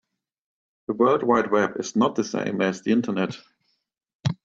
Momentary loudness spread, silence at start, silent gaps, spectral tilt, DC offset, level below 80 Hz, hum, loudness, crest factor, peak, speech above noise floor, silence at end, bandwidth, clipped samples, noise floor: 10 LU; 0.9 s; 4.14-4.20 s; -6 dB/octave; under 0.1%; -64 dBFS; none; -23 LUFS; 18 dB; -6 dBFS; 51 dB; 0.1 s; 7.8 kHz; under 0.1%; -74 dBFS